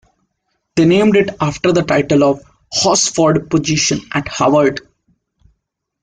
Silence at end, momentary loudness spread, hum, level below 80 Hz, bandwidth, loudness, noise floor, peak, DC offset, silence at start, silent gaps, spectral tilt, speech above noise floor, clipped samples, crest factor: 1.25 s; 9 LU; none; -46 dBFS; 9.8 kHz; -14 LUFS; -71 dBFS; -2 dBFS; under 0.1%; 0.75 s; none; -4.5 dB/octave; 58 dB; under 0.1%; 14 dB